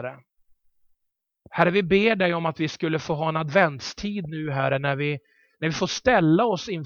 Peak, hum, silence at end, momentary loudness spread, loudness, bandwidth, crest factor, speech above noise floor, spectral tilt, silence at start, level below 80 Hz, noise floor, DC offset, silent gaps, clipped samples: -4 dBFS; none; 0 s; 11 LU; -23 LUFS; 7.2 kHz; 20 dB; 56 dB; -5.5 dB/octave; 0 s; -54 dBFS; -79 dBFS; under 0.1%; none; under 0.1%